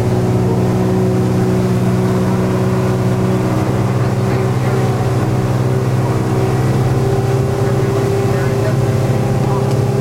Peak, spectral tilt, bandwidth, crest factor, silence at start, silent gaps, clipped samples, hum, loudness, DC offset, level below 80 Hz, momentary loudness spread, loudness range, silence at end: -4 dBFS; -7.5 dB/octave; 15.5 kHz; 10 dB; 0 s; none; under 0.1%; none; -15 LUFS; under 0.1%; -34 dBFS; 1 LU; 1 LU; 0 s